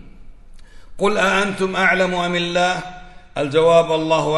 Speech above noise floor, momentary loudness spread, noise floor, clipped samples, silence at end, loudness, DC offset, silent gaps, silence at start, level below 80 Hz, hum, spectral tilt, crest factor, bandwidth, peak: 21 dB; 11 LU; -38 dBFS; under 0.1%; 0 s; -17 LUFS; under 0.1%; none; 0 s; -42 dBFS; none; -4.5 dB/octave; 16 dB; 11.5 kHz; -2 dBFS